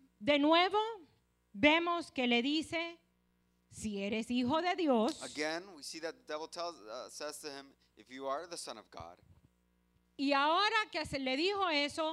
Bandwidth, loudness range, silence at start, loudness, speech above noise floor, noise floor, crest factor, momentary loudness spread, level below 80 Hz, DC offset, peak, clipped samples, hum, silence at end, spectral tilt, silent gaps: 13.5 kHz; 11 LU; 0.2 s; -34 LUFS; 41 dB; -75 dBFS; 22 dB; 18 LU; -68 dBFS; under 0.1%; -14 dBFS; under 0.1%; 60 Hz at -60 dBFS; 0 s; -3.5 dB/octave; none